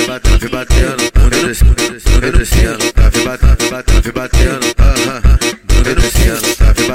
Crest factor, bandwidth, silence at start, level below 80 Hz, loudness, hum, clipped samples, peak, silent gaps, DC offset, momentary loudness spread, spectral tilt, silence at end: 10 dB; 16.5 kHz; 0 s; -12 dBFS; -12 LUFS; none; under 0.1%; 0 dBFS; none; 3%; 3 LU; -4.5 dB/octave; 0 s